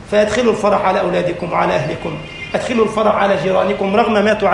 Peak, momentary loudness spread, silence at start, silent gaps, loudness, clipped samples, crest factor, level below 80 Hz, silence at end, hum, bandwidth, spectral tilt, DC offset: -2 dBFS; 8 LU; 0 s; none; -16 LUFS; under 0.1%; 14 dB; -42 dBFS; 0 s; none; 11.5 kHz; -5.5 dB/octave; under 0.1%